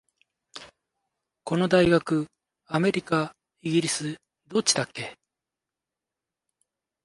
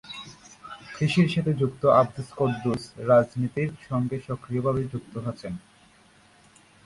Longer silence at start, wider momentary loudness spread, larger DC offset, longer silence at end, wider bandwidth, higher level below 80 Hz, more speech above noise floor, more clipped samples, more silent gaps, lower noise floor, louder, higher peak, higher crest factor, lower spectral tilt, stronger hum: first, 0.55 s vs 0.05 s; first, 22 LU vs 19 LU; neither; first, 1.9 s vs 1.25 s; about the same, 11.5 kHz vs 11.5 kHz; about the same, -58 dBFS vs -56 dBFS; first, 64 dB vs 32 dB; neither; neither; first, -88 dBFS vs -57 dBFS; about the same, -25 LUFS vs -25 LUFS; about the same, -6 dBFS vs -6 dBFS; about the same, 22 dB vs 20 dB; second, -4.5 dB/octave vs -7.5 dB/octave; neither